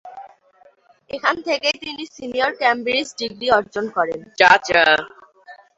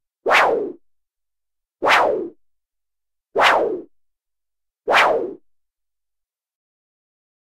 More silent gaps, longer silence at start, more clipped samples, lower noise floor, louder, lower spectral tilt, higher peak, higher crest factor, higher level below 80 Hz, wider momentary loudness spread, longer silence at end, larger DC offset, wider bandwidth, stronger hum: neither; second, 0.05 s vs 0.25 s; neither; second, -54 dBFS vs -86 dBFS; about the same, -18 LUFS vs -17 LUFS; about the same, -2.5 dB/octave vs -2 dB/octave; about the same, 0 dBFS vs -2 dBFS; about the same, 20 dB vs 20 dB; about the same, -58 dBFS vs -62 dBFS; about the same, 16 LU vs 16 LU; second, 0.25 s vs 2.2 s; neither; second, 8 kHz vs 16 kHz; neither